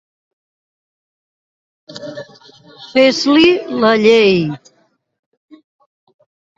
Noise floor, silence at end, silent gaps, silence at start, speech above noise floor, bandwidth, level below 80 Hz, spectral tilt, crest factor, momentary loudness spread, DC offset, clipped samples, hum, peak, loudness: -43 dBFS; 2 s; none; 1.9 s; 32 dB; 7.8 kHz; -58 dBFS; -5 dB/octave; 18 dB; 22 LU; under 0.1%; under 0.1%; none; 0 dBFS; -12 LUFS